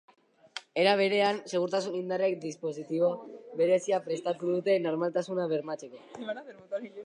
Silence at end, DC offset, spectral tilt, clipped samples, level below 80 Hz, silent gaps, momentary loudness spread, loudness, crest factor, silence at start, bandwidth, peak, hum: 0 s; under 0.1%; -5 dB/octave; under 0.1%; -84 dBFS; none; 15 LU; -30 LUFS; 18 dB; 0.55 s; 10.5 kHz; -12 dBFS; none